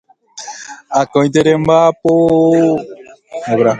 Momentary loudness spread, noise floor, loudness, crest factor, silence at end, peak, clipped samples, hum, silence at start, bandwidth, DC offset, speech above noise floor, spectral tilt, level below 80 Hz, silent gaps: 19 LU; -32 dBFS; -12 LUFS; 14 dB; 0 s; 0 dBFS; under 0.1%; none; 0.35 s; 9.2 kHz; under 0.1%; 21 dB; -6 dB/octave; -50 dBFS; none